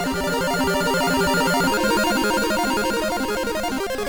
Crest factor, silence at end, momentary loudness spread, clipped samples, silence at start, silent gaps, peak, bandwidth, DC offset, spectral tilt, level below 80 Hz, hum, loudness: 10 dB; 0 s; 5 LU; under 0.1%; 0 s; none; -12 dBFS; over 20 kHz; under 0.1%; -3.5 dB/octave; -40 dBFS; none; -21 LUFS